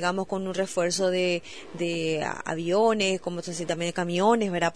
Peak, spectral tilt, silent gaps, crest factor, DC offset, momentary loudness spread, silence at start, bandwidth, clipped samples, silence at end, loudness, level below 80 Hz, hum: -10 dBFS; -4.5 dB/octave; none; 16 dB; 0.4%; 9 LU; 0 s; 11 kHz; under 0.1%; 0.05 s; -26 LUFS; -62 dBFS; none